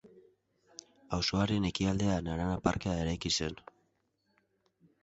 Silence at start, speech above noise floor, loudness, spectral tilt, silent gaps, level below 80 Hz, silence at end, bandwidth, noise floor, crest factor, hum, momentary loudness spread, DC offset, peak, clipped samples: 0.05 s; 45 dB; -32 LUFS; -5 dB/octave; none; -50 dBFS; 1.45 s; 8.2 kHz; -77 dBFS; 20 dB; none; 21 LU; under 0.1%; -14 dBFS; under 0.1%